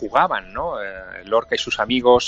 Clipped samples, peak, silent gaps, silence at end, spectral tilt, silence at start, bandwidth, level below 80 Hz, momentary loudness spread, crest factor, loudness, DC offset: under 0.1%; -2 dBFS; none; 0 s; -3.5 dB/octave; 0 s; 8 kHz; -48 dBFS; 12 LU; 18 dB; -21 LUFS; under 0.1%